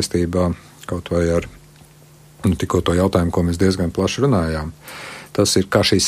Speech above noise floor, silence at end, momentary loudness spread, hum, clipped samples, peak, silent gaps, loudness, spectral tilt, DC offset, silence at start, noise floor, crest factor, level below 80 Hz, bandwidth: 28 dB; 0 s; 15 LU; none; under 0.1%; -2 dBFS; none; -19 LUFS; -5 dB/octave; under 0.1%; 0 s; -46 dBFS; 18 dB; -36 dBFS; 15.5 kHz